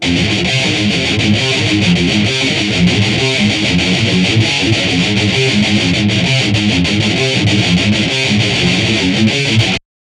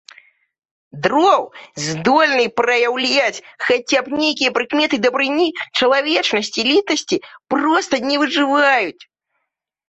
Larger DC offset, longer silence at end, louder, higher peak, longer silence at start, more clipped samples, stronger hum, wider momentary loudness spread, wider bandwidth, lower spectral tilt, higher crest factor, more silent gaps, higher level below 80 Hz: neither; second, 0.25 s vs 0.85 s; first, -12 LUFS vs -16 LUFS; about the same, 0 dBFS vs -2 dBFS; second, 0 s vs 0.95 s; neither; neither; second, 1 LU vs 8 LU; first, 11.5 kHz vs 8.2 kHz; first, -4.5 dB/octave vs -3 dB/octave; about the same, 12 dB vs 16 dB; neither; first, -34 dBFS vs -62 dBFS